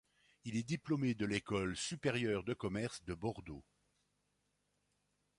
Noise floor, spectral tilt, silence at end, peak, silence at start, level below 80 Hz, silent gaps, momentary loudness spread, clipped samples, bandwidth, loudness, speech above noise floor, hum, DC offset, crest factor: -82 dBFS; -5 dB/octave; 1.8 s; -20 dBFS; 0.45 s; -64 dBFS; none; 11 LU; under 0.1%; 11.5 kHz; -39 LUFS; 43 dB; 50 Hz at -65 dBFS; under 0.1%; 20 dB